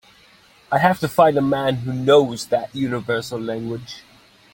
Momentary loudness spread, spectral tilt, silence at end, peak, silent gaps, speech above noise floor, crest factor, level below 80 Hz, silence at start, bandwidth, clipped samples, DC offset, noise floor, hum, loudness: 13 LU; -6 dB/octave; 0.55 s; 0 dBFS; none; 33 dB; 20 dB; -56 dBFS; 0.7 s; 17 kHz; under 0.1%; under 0.1%; -52 dBFS; none; -20 LUFS